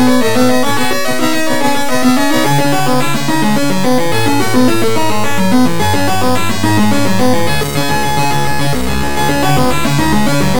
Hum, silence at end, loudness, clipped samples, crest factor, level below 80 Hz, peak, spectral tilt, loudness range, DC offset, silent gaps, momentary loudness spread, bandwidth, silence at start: none; 0 s; -13 LUFS; under 0.1%; 12 dB; -32 dBFS; 0 dBFS; -4.5 dB/octave; 1 LU; 20%; none; 3 LU; 18 kHz; 0 s